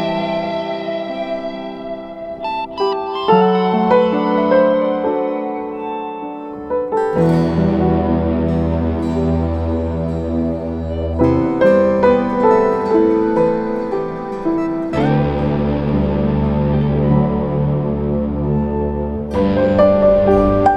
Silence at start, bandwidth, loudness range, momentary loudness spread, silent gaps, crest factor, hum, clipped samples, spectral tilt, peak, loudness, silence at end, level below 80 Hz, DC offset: 0 s; 8.4 kHz; 4 LU; 11 LU; none; 16 dB; none; under 0.1%; -9 dB/octave; 0 dBFS; -17 LUFS; 0 s; -32 dBFS; under 0.1%